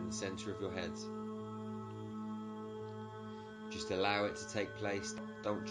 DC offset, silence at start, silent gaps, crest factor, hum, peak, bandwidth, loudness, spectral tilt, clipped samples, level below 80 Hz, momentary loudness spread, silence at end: under 0.1%; 0 s; none; 22 dB; none; -18 dBFS; 10.5 kHz; -41 LUFS; -4.5 dB/octave; under 0.1%; -66 dBFS; 11 LU; 0 s